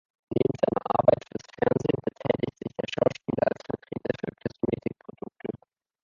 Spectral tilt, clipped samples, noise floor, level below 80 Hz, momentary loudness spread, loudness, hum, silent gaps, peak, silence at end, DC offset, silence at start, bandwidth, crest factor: -7.5 dB/octave; under 0.1%; -52 dBFS; -58 dBFS; 15 LU; -28 LUFS; none; none; -4 dBFS; 0.45 s; under 0.1%; 0.3 s; 7.4 kHz; 24 dB